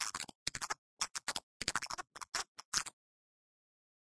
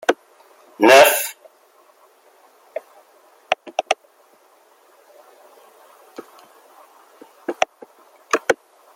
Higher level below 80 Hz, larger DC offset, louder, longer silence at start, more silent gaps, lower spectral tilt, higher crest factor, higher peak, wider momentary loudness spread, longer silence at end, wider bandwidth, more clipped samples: about the same, -68 dBFS vs -72 dBFS; neither; second, -40 LUFS vs -18 LUFS; about the same, 0 s vs 0.1 s; first, 0.35-0.46 s, 0.78-0.97 s, 1.43-1.60 s, 2.48-2.55 s, 2.65-2.72 s vs none; second, 0.5 dB/octave vs -1.5 dB/octave; first, 30 dB vs 22 dB; second, -12 dBFS vs 0 dBFS; second, 5 LU vs 26 LU; first, 1.1 s vs 0.45 s; second, 11 kHz vs 16.5 kHz; neither